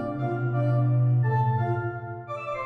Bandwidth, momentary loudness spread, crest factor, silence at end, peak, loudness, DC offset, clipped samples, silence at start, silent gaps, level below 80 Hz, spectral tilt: 4.2 kHz; 11 LU; 10 dB; 0 s; -14 dBFS; -26 LUFS; under 0.1%; under 0.1%; 0 s; none; -58 dBFS; -10.5 dB/octave